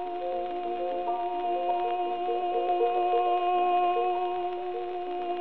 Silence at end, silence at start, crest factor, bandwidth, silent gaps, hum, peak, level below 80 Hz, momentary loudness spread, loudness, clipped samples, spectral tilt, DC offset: 0 s; 0 s; 14 dB; 4.4 kHz; none; none; -14 dBFS; -62 dBFS; 7 LU; -29 LUFS; under 0.1%; -6.5 dB/octave; 0.5%